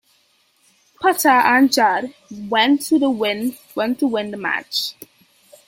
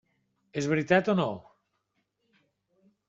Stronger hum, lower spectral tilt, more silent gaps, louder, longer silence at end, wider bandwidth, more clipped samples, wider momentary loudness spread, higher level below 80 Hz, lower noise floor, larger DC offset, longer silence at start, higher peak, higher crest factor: neither; second, -2.5 dB/octave vs -5 dB/octave; neither; first, -18 LUFS vs -27 LUFS; second, 0.75 s vs 1.7 s; first, 16.5 kHz vs 7.8 kHz; neither; second, 11 LU vs 14 LU; about the same, -66 dBFS vs -70 dBFS; second, -60 dBFS vs -78 dBFS; neither; first, 1 s vs 0.55 s; first, -2 dBFS vs -8 dBFS; second, 18 dB vs 24 dB